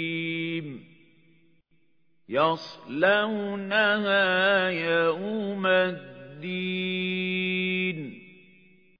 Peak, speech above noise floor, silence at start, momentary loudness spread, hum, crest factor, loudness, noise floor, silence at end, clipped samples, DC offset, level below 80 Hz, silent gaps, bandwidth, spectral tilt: -8 dBFS; 47 dB; 0 s; 14 LU; none; 20 dB; -25 LUFS; -72 dBFS; 0.7 s; under 0.1%; under 0.1%; -76 dBFS; none; 5.4 kHz; -7 dB/octave